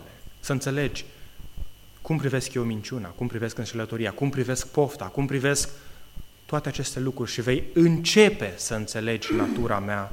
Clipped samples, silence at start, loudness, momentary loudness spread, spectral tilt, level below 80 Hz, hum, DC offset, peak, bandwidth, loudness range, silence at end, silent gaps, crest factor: under 0.1%; 0 s; -26 LUFS; 12 LU; -5 dB/octave; -44 dBFS; none; under 0.1%; -4 dBFS; 16.5 kHz; 7 LU; 0 s; none; 22 dB